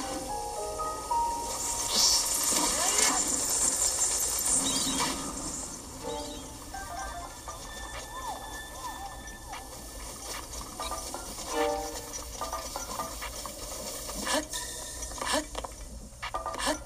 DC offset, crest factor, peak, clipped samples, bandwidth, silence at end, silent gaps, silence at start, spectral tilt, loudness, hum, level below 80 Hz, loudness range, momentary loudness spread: under 0.1%; 22 dB; -10 dBFS; under 0.1%; 15.5 kHz; 0 s; none; 0 s; -1 dB/octave; -29 LUFS; none; -48 dBFS; 14 LU; 16 LU